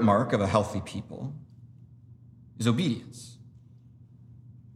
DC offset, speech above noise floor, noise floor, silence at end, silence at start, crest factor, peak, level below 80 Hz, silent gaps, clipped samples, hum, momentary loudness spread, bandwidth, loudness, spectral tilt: under 0.1%; 26 dB; -53 dBFS; 0.2 s; 0 s; 22 dB; -8 dBFS; -62 dBFS; none; under 0.1%; none; 27 LU; 13 kHz; -28 LUFS; -6.5 dB/octave